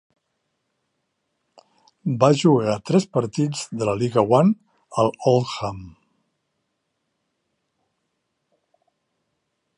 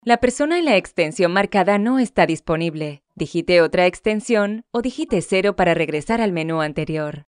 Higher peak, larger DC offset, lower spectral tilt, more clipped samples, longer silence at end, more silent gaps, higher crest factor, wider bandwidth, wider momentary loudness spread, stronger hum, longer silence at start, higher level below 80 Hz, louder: about the same, -2 dBFS vs -2 dBFS; neither; about the same, -6.5 dB/octave vs -5.5 dB/octave; neither; first, 3.9 s vs 0.05 s; neither; about the same, 22 dB vs 18 dB; about the same, 11 kHz vs 10 kHz; first, 13 LU vs 8 LU; neither; first, 2.05 s vs 0.05 s; second, -60 dBFS vs -48 dBFS; about the same, -21 LUFS vs -19 LUFS